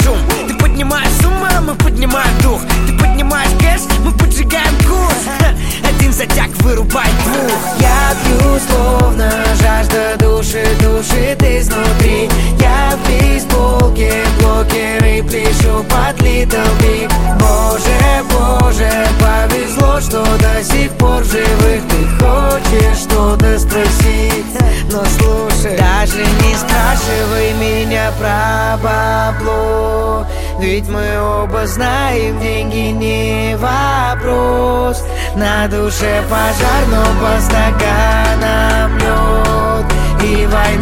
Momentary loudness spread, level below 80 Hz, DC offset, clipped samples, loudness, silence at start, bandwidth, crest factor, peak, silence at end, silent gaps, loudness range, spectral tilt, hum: 4 LU; -14 dBFS; 3%; under 0.1%; -12 LUFS; 0 s; 17 kHz; 10 dB; 0 dBFS; 0 s; none; 3 LU; -5 dB/octave; none